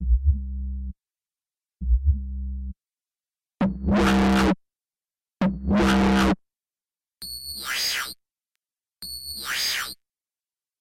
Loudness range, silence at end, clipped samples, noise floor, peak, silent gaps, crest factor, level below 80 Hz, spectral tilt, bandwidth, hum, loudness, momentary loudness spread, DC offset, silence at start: 8 LU; 0.85 s; under 0.1%; under -90 dBFS; -10 dBFS; none; 16 dB; -30 dBFS; -5 dB/octave; 16.5 kHz; none; -24 LUFS; 17 LU; under 0.1%; 0 s